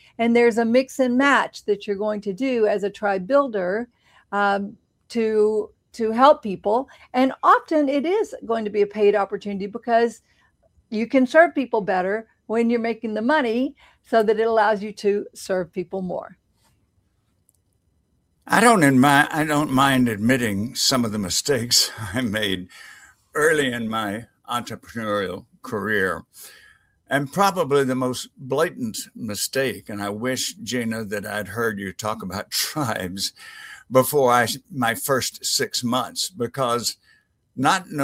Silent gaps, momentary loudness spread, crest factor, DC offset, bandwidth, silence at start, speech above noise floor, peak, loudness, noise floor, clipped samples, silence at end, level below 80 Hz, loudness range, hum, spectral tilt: none; 12 LU; 22 dB; under 0.1%; 16 kHz; 0.2 s; 45 dB; 0 dBFS; -21 LUFS; -67 dBFS; under 0.1%; 0 s; -60 dBFS; 7 LU; none; -4 dB/octave